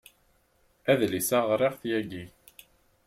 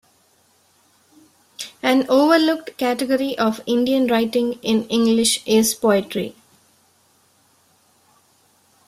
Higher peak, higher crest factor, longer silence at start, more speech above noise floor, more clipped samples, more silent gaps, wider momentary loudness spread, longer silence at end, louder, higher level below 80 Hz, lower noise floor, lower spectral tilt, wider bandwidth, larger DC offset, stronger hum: second, -10 dBFS vs -2 dBFS; about the same, 20 dB vs 18 dB; second, 0.85 s vs 1.6 s; about the same, 40 dB vs 41 dB; neither; neither; first, 15 LU vs 9 LU; second, 0.8 s vs 2.55 s; second, -27 LUFS vs -18 LUFS; second, -66 dBFS vs -60 dBFS; first, -67 dBFS vs -59 dBFS; about the same, -4.5 dB/octave vs -3.5 dB/octave; about the same, 16.5 kHz vs 15.5 kHz; neither; neither